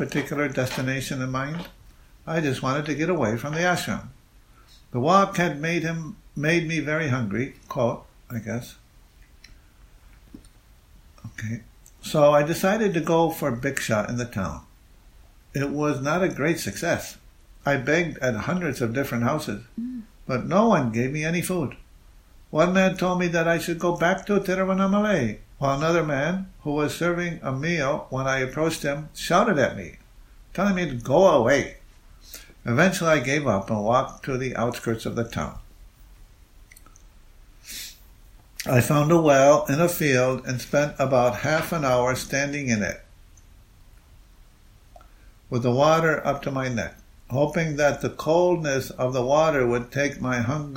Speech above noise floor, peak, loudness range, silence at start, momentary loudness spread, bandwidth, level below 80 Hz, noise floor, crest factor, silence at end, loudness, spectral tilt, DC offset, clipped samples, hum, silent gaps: 30 dB; -2 dBFS; 9 LU; 0 s; 14 LU; 16 kHz; -50 dBFS; -53 dBFS; 22 dB; 0 s; -23 LUFS; -5.5 dB/octave; under 0.1%; under 0.1%; none; none